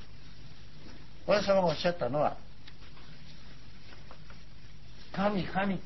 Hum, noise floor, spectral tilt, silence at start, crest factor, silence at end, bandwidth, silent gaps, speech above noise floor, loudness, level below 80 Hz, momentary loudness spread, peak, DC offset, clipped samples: none; -52 dBFS; -6 dB/octave; 0 s; 22 dB; 0 s; 6 kHz; none; 23 dB; -30 LUFS; -56 dBFS; 25 LU; -12 dBFS; 1%; under 0.1%